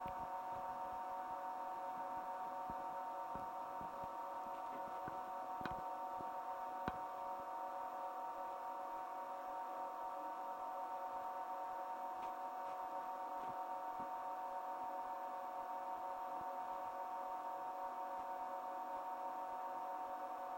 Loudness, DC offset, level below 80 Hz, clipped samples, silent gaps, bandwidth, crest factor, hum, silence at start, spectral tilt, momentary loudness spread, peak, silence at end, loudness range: -46 LUFS; under 0.1%; -76 dBFS; under 0.1%; none; 16 kHz; 20 dB; none; 0 s; -5 dB/octave; 1 LU; -26 dBFS; 0 s; 1 LU